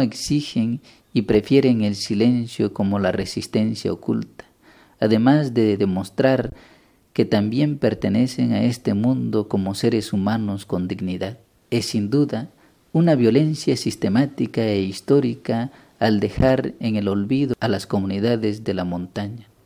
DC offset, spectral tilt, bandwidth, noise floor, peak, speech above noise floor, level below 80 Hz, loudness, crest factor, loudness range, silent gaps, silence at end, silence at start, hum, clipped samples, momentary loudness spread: under 0.1%; -6.5 dB/octave; 16 kHz; -52 dBFS; -2 dBFS; 32 dB; -46 dBFS; -21 LUFS; 18 dB; 3 LU; none; 0.25 s; 0 s; none; under 0.1%; 9 LU